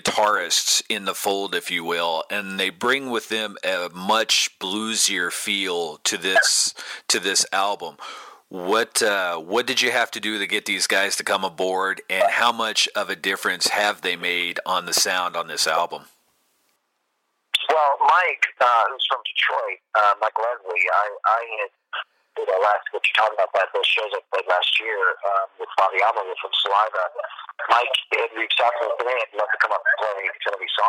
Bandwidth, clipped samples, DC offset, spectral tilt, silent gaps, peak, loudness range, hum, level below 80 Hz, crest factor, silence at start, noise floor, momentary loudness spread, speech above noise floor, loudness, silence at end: 17 kHz; under 0.1%; under 0.1%; -0.5 dB/octave; none; -2 dBFS; 2 LU; none; -74 dBFS; 20 dB; 0.05 s; -73 dBFS; 8 LU; 51 dB; -21 LUFS; 0 s